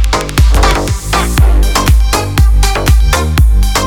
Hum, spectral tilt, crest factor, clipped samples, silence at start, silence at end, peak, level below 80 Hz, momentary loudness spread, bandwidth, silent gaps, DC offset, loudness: none; -4.5 dB/octave; 8 dB; under 0.1%; 0 s; 0 s; 0 dBFS; -10 dBFS; 3 LU; 18 kHz; none; 1%; -11 LUFS